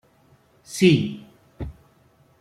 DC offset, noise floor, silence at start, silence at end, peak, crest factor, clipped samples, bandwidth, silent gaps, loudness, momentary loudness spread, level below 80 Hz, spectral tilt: under 0.1%; -58 dBFS; 0.7 s; 0.7 s; -4 dBFS; 20 dB; under 0.1%; 15 kHz; none; -20 LUFS; 20 LU; -48 dBFS; -6 dB/octave